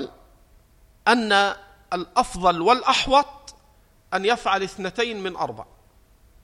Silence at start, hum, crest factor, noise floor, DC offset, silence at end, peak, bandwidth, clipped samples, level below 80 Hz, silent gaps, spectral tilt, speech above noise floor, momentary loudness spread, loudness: 0 s; none; 20 dB; -56 dBFS; under 0.1%; 0.8 s; -4 dBFS; 14 kHz; under 0.1%; -48 dBFS; none; -3.5 dB/octave; 35 dB; 13 LU; -22 LUFS